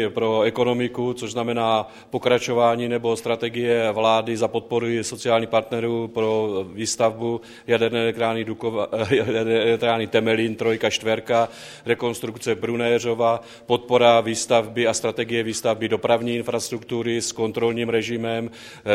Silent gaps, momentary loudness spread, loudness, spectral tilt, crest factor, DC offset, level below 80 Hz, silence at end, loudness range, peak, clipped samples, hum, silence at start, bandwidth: none; 7 LU; -22 LUFS; -4.5 dB/octave; 20 dB; under 0.1%; -62 dBFS; 0 s; 3 LU; -2 dBFS; under 0.1%; none; 0 s; 15 kHz